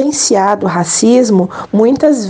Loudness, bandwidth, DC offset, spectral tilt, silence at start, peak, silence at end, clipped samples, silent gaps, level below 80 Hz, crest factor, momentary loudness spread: -11 LUFS; 10 kHz; under 0.1%; -4.5 dB/octave; 0 s; 0 dBFS; 0 s; under 0.1%; none; -52 dBFS; 10 dB; 5 LU